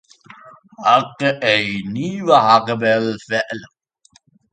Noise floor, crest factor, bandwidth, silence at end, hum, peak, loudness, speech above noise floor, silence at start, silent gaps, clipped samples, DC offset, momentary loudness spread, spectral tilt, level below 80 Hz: -56 dBFS; 18 dB; 9.2 kHz; 0.85 s; none; 0 dBFS; -17 LUFS; 39 dB; 0.45 s; none; under 0.1%; under 0.1%; 11 LU; -5 dB/octave; -60 dBFS